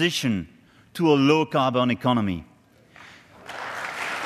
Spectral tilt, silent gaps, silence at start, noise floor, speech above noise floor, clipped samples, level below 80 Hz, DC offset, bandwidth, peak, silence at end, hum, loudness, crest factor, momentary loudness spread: -5.5 dB/octave; none; 0 s; -53 dBFS; 32 dB; under 0.1%; -62 dBFS; under 0.1%; 14 kHz; -6 dBFS; 0 s; none; -23 LUFS; 20 dB; 20 LU